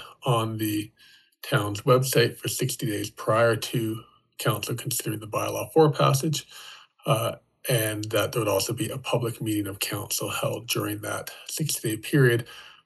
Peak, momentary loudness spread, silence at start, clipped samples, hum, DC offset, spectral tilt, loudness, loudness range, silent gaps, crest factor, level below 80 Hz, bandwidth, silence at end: -6 dBFS; 11 LU; 0 s; under 0.1%; none; under 0.1%; -4.5 dB/octave; -26 LUFS; 2 LU; none; 20 dB; -64 dBFS; 12.5 kHz; 0.15 s